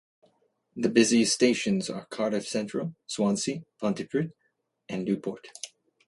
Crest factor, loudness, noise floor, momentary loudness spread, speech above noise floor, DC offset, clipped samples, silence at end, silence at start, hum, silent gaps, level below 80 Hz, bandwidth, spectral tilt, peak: 22 dB; -27 LUFS; -75 dBFS; 16 LU; 48 dB; under 0.1%; under 0.1%; 0.4 s; 0.75 s; none; none; -70 dBFS; 11.5 kHz; -4 dB/octave; -6 dBFS